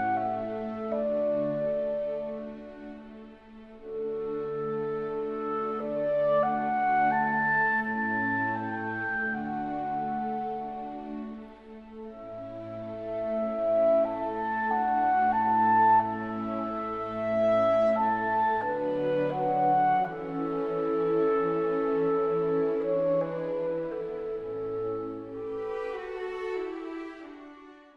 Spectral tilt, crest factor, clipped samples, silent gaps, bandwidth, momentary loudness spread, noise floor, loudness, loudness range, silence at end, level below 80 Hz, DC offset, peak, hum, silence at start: -8 dB/octave; 16 dB; under 0.1%; none; 6.2 kHz; 15 LU; -50 dBFS; -28 LUFS; 10 LU; 0.15 s; -60 dBFS; under 0.1%; -14 dBFS; none; 0 s